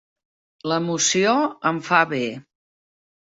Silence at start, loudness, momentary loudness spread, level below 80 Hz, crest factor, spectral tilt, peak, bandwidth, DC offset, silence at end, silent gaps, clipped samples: 0.65 s; -20 LUFS; 11 LU; -66 dBFS; 20 dB; -3 dB/octave; -2 dBFS; 8 kHz; under 0.1%; 0.85 s; none; under 0.1%